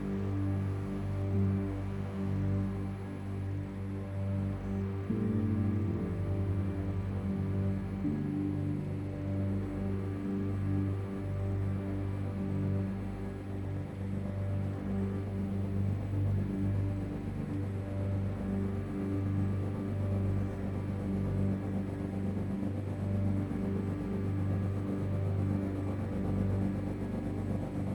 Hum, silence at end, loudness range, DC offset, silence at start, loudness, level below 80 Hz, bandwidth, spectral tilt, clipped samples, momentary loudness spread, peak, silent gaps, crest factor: none; 0 s; 2 LU; under 0.1%; 0 s; -35 LUFS; -48 dBFS; 11 kHz; -9.5 dB/octave; under 0.1%; 5 LU; -20 dBFS; none; 14 dB